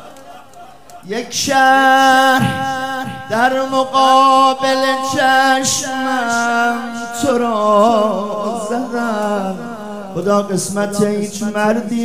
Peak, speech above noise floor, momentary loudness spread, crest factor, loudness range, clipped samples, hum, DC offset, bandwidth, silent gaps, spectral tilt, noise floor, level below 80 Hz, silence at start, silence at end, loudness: 0 dBFS; 25 dB; 12 LU; 14 dB; 6 LU; under 0.1%; none; 1%; 16 kHz; none; -3.5 dB/octave; -39 dBFS; -56 dBFS; 0 s; 0 s; -14 LUFS